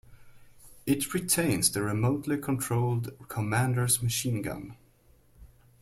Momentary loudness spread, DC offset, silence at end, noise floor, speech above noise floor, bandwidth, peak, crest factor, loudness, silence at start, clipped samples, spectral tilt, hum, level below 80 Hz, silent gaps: 11 LU; under 0.1%; 0.35 s; -61 dBFS; 33 dB; 16.5 kHz; -10 dBFS; 20 dB; -28 LUFS; 0.1 s; under 0.1%; -4.5 dB/octave; none; -56 dBFS; none